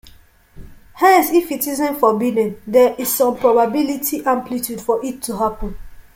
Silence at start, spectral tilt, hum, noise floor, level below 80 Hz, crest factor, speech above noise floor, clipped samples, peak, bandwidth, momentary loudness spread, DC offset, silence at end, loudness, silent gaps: 0.55 s; -4 dB/octave; none; -46 dBFS; -40 dBFS; 16 dB; 30 dB; under 0.1%; -2 dBFS; 17 kHz; 9 LU; under 0.1%; 0.15 s; -17 LUFS; none